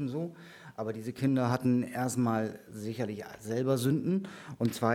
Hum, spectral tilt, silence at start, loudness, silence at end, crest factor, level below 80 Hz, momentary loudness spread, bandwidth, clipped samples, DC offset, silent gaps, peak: none; -6.5 dB/octave; 0 s; -32 LUFS; 0 s; 20 dB; -70 dBFS; 13 LU; 16.5 kHz; under 0.1%; under 0.1%; none; -12 dBFS